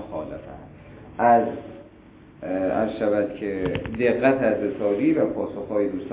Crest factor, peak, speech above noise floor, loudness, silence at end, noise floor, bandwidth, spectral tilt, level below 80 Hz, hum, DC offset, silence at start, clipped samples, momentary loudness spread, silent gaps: 18 dB; -6 dBFS; 26 dB; -23 LUFS; 0 s; -48 dBFS; 4 kHz; -11 dB/octave; -50 dBFS; none; under 0.1%; 0 s; under 0.1%; 19 LU; none